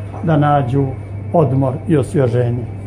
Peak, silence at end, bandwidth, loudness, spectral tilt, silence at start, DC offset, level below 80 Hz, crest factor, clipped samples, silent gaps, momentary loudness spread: 0 dBFS; 0 s; 10.5 kHz; -16 LUFS; -9 dB/octave; 0 s; under 0.1%; -40 dBFS; 16 dB; under 0.1%; none; 6 LU